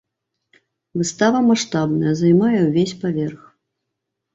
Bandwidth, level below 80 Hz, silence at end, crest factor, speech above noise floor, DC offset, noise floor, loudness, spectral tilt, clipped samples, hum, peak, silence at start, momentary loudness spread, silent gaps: 8 kHz; -60 dBFS; 1 s; 16 dB; 62 dB; under 0.1%; -79 dBFS; -18 LUFS; -6 dB/octave; under 0.1%; none; -4 dBFS; 0.95 s; 9 LU; none